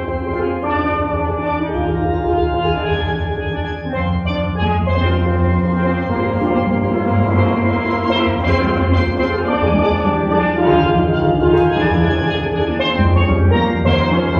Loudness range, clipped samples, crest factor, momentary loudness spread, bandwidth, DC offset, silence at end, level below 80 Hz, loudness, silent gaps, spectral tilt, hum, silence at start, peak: 4 LU; under 0.1%; 14 dB; 6 LU; 5.6 kHz; 0.2%; 0 s; -32 dBFS; -17 LUFS; none; -9 dB/octave; none; 0 s; -2 dBFS